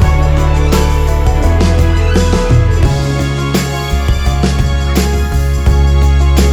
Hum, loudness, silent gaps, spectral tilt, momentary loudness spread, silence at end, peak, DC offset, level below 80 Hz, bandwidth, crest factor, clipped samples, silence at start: none; -12 LUFS; none; -6 dB/octave; 4 LU; 0 s; 0 dBFS; under 0.1%; -12 dBFS; 19 kHz; 10 dB; under 0.1%; 0 s